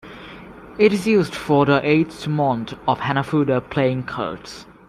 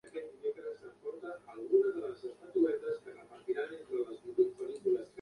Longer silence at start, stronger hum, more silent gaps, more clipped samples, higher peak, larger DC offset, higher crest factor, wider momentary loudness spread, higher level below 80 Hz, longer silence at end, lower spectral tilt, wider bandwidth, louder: about the same, 0.05 s vs 0.05 s; neither; neither; neither; first, -2 dBFS vs -16 dBFS; neither; about the same, 18 dB vs 18 dB; first, 21 LU vs 15 LU; first, -52 dBFS vs -80 dBFS; first, 0.25 s vs 0 s; about the same, -7 dB/octave vs -6.5 dB/octave; first, 14 kHz vs 10.5 kHz; first, -20 LUFS vs -36 LUFS